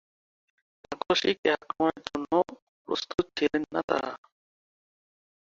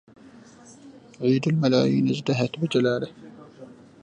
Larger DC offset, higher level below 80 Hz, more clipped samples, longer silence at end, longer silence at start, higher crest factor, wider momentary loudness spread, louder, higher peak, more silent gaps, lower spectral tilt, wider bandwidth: neither; about the same, -62 dBFS vs -66 dBFS; neither; first, 1.25 s vs 0.3 s; about the same, 0.9 s vs 0.85 s; about the same, 22 dB vs 18 dB; first, 12 LU vs 9 LU; second, -29 LUFS vs -23 LUFS; about the same, -8 dBFS vs -8 dBFS; first, 1.38-1.43 s, 2.62-2.85 s, 3.84-3.88 s vs none; second, -4 dB/octave vs -7 dB/octave; second, 7.6 kHz vs 9.8 kHz